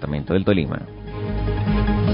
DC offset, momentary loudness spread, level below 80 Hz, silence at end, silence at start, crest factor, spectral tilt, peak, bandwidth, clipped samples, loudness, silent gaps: under 0.1%; 11 LU; -28 dBFS; 0 s; 0 s; 16 dB; -12.5 dB/octave; -4 dBFS; 5.4 kHz; under 0.1%; -22 LUFS; none